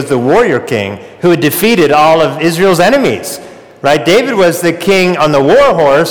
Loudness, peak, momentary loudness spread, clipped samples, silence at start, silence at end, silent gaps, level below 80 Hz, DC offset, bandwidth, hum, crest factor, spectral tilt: -9 LUFS; -2 dBFS; 9 LU; under 0.1%; 0 s; 0 s; none; -42 dBFS; 1%; over 20 kHz; none; 8 dB; -5 dB/octave